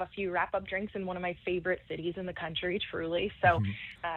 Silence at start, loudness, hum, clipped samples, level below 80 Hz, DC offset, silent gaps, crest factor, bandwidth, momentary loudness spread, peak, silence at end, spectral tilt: 0 s; -33 LUFS; none; under 0.1%; -58 dBFS; under 0.1%; none; 22 dB; 4.6 kHz; 10 LU; -12 dBFS; 0 s; -8 dB/octave